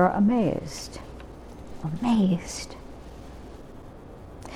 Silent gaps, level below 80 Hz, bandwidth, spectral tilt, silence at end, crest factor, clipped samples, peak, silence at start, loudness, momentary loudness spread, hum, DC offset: none; -46 dBFS; 14 kHz; -6.5 dB/octave; 0 s; 20 dB; under 0.1%; -8 dBFS; 0 s; -26 LUFS; 23 LU; none; under 0.1%